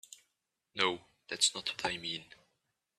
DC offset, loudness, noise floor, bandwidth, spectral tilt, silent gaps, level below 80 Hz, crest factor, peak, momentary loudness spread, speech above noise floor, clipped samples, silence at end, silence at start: under 0.1%; -33 LUFS; -84 dBFS; 14 kHz; -0.5 dB/octave; none; -72 dBFS; 24 dB; -14 dBFS; 16 LU; 49 dB; under 0.1%; 0.75 s; 0.1 s